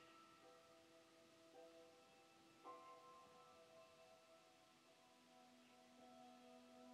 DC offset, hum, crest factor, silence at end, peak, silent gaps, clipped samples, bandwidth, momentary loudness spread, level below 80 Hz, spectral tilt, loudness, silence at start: under 0.1%; none; 20 dB; 0 s; -48 dBFS; none; under 0.1%; 13 kHz; 7 LU; under -90 dBFS; -3 dB/octave; -67 LUFS; 0 s